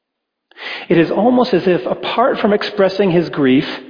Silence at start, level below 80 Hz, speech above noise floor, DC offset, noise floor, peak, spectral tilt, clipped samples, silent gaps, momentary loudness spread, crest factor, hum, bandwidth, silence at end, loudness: 0.6 s; -54 dBFS; 62 dB; under 0.1%; -76 dBFS; -2 dBFS; -8 dB/octave; under 0.1%; none; 6 LU; 14 dB; none; 5.2 kHz; 0 s; -15 LUFS